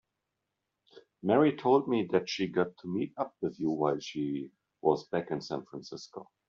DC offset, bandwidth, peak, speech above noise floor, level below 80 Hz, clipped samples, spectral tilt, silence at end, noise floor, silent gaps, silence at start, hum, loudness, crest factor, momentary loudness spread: under 0.1%; 7.4 kHz; -12 dBFS; 55 dB; -72 dBFS; under 0.1%; -5 dB/octave; 0.25 s; -85 dBFS; none; 0.95 s; none; -31 LUFS; 20 dB; 17 LU